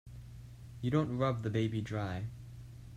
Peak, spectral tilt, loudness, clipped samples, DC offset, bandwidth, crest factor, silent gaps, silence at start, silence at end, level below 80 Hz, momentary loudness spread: -18 dBFS; -8 dB/octave; -35 LUFS; under 0.1%; under 0.1%; 12.5 kHz; 18 dB; none; 0.05 s; 0 s; -56 dBFS; 19 LU